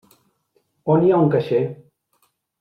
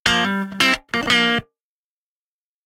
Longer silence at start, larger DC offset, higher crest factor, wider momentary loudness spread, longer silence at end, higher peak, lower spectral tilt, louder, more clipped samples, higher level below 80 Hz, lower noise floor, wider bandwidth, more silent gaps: first, 0.85 s vs 0.05 s; neither; about the same, 16 dB vs 20 dB; first, 12 LU vs 6 LU; second, 0.85 s vs 1.25 s; second, -6 dBFS vs 0 dBFS; first, -10 dB/octave vs -3 dB/octave; about the same, -19 LUFS vs -18 LUFS; neither; second, -62 dBFS vs -50 dBFS; second, -67 dBFS vs under -90 dBFS; second, 5.6 kHz vs 16.5 kHz; neither